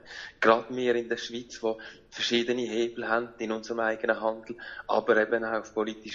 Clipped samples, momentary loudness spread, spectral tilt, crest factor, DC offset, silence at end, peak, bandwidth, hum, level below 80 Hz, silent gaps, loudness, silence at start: under 0.1%; 13 LU; -3.5 dB/octave; 24 dB; under 0.1%; 0 s; -6 dBFS; 7.6 kHz; none; -66 dBFS; none; -28 LUFS; 0.05 s